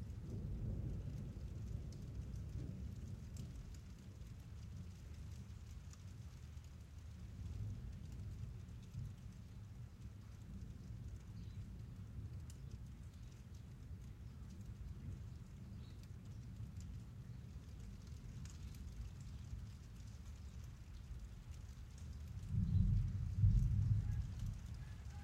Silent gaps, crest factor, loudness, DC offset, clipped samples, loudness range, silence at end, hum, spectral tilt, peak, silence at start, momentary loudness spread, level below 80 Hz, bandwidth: none; 22 dB; -48 LUFS; under 0.1%; under 0.1%; 13 LU; 0 s; none; -7.5 dB/octave; -24 dBFS; 0 s; 15 LU; -50 dBFS; 13.5 kHz